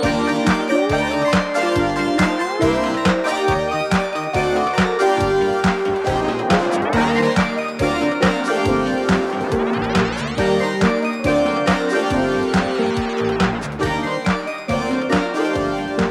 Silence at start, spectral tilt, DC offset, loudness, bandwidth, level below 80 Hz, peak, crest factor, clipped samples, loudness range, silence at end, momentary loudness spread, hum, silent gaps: 0 s; -5.5 dB/octave; under 0.1%; -19 LUFS; 13 kHz; -38 dBFS; -2 dBFS; 16 dB; under 0.1%; 2 LU; 0 s; 4 LU; none; none